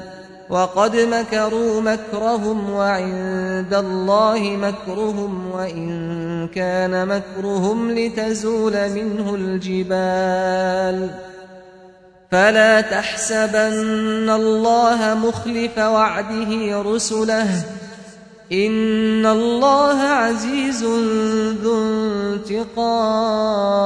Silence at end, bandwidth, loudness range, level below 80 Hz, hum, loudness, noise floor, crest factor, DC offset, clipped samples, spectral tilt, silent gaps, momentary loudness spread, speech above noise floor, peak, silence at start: 0 s; 10.5 kHz; 4 LU; -52 dBFS; none; -19 LUFS; -46 dBFS; 16 dB; under 0.1%; under 0.1%; -4.5 dB/octave; none; 9 LU; 28 dB; -2 dBFS; 0 s